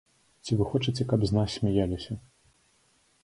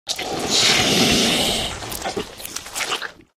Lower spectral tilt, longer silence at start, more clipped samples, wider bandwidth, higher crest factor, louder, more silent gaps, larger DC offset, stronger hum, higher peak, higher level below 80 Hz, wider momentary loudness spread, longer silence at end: first, -7 dB/octave vs -2 dB/octave; first, 0.45 s vs 0.05 s; neither; second, 11.5 kHz vs 16.5 kHz; about the same, 18 dB vs 18 dB; second, -28 LUFS vs -18 LUFS; neither; neither; neither; second, -10 dBFS vs -2 dBFS; second, -48 dBFS vs -42 dBFS; about the same, 14 LU vs 14 LU; first, 1.05 s vs 0.25 s